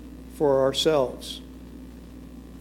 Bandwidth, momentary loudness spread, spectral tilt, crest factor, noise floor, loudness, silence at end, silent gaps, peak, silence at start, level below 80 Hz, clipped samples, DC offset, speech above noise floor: 16.5 kHz; 22 LU; -4.5 dB/octave; 16 dB; -42 dBFS; -23 LUFS; 0 s; none; -10 dBFS; 0 s; -46 dBFS; under 0.1%; under 0.1%; 19 dB